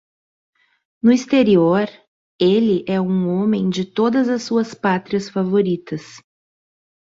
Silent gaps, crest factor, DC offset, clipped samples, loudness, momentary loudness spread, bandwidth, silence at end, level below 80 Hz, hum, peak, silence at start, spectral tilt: 2.08-2.39 s; 16 dB; under 0.1%; under 0.1%; -18 LUFS; 7 LU; 7.8 kHz; 0.85 s; -60 dBFS; none; -4 dBFS; 1.05 s; -7 dB/octave